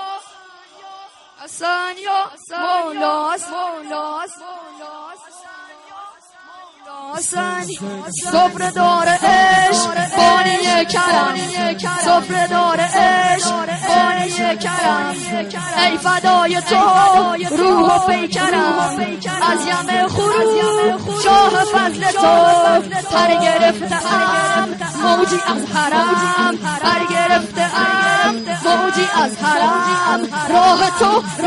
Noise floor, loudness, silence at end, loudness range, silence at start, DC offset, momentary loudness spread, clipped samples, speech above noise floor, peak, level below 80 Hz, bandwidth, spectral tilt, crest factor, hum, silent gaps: -43 dBFS; -15 LUFS; 0 s; 10 LU; 0 s; under 0.1%; 12 LU; under 0.1%; 27 dB; -2 dBFS; -52 dBFS; 11.5 kHz; -3 dB/octave; 14 dB; none; none